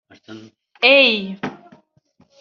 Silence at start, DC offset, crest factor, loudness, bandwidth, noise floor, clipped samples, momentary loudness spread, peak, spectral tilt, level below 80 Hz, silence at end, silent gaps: 0.3 s; under 0.1%; 20 dB; -13 LUFS; 6.8 kHz; -59 dBFS; under 0.1%; 19 LU; -2 dBFS; 0 dB/octave; -70 dBFS; 0.85 s; none